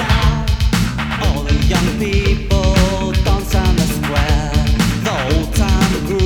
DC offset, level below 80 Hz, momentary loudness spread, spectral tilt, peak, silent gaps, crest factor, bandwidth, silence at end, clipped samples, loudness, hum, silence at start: under 0.1%; -18 dBFS; 3 LU; -5.5 dB/octave; 0 dBFS; none; 14 dB; 19.5 kHz; 0 s; under 0.1%; -16 LUFS; none; 0 s